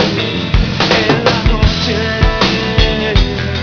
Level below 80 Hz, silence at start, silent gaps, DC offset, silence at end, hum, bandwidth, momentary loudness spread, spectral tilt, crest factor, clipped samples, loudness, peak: -18 dBFS; 0 s; none; 0.3%; 0 s; none; 5.4 kHz; 4 LU; -5.5 dB/octave; 12 dB; 0.2%; -13 LUFS; 0 dBFS